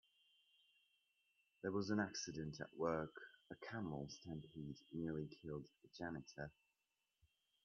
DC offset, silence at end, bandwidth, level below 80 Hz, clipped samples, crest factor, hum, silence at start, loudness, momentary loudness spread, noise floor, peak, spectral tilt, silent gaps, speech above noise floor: under 0.1%; 1.15 s; 7.2 kHz; -74 dBFS; under 0.1%; 22 dB; none; 1.65 s; -48 LUFS; 12 LU; -90 dBFS; -26 dBFS; -5 dB/octave; none; 42 dB